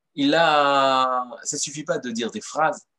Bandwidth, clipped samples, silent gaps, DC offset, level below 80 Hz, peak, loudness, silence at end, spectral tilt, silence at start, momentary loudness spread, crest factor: 12 kHz; under 0.1%; none; under 0.1%; -78 dBFS; -6 dBFS; -21 LUFS; 0.2 s; -3 dB/octave; 0.15 s; 11 LU; 18 dB